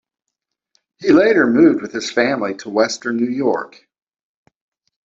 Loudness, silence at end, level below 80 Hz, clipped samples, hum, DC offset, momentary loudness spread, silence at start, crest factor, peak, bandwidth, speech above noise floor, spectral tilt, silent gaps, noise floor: -16 LUFS; 1.4 s; -60 dBFS; under 0.1%; none; under 0.1%; 10 LU; 1 s; 16 dB; -2 dBFS; 7.8 kHz; 64 dB; -5 dB/octave; none; -80 dBFS